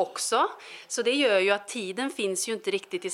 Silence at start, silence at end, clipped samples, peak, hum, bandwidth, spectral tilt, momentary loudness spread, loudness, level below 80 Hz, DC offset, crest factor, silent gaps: 0 s; 0 s; under 0.1%; -8 dBFS; none; 16 kHz; -2 dB/octave; 10 LU; -27 LUFS; -86 dBFS; under 0.1%; 20 dB; none